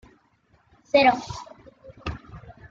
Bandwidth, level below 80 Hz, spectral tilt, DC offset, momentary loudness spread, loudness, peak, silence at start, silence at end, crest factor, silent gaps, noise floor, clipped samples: 7.6 kHz; -50 dBFS; -5 dB/octave; under 0.1%; 27 LU; -22 LUFS; -6 dBFS; 0.95 s; 0.2 s; 20 dB; none; -63 dBFS; under 0.1%